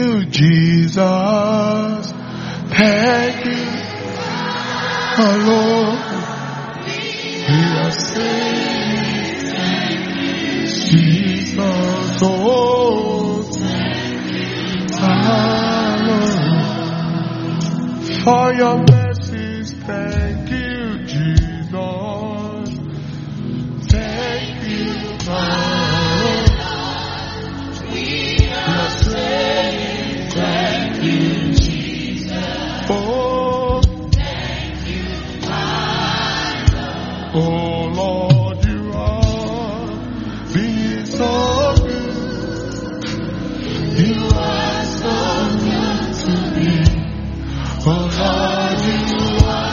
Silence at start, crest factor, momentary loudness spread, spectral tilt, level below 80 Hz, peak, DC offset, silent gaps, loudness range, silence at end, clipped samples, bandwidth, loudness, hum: 0 s; 16 dB; 10 LU; -5 dB/octave; -28 dBFS; 0 dBFS; under 0.1%; none; 4 LU; 0 s; under 0.1%; 7.2 kHz; -18 LUFS; none